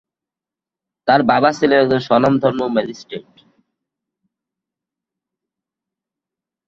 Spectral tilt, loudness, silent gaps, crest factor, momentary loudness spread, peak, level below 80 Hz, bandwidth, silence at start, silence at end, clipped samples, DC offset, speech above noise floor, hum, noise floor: -6.5 dB/octave; -15 LUFS; none; 18 dB; 16 LU; -2 dBFS; -56 dBFS; 7.8 kHz; 1.05 s; 3.45 s; under 0.1%; under 0.1%; 73 dB; none; -88 dBFS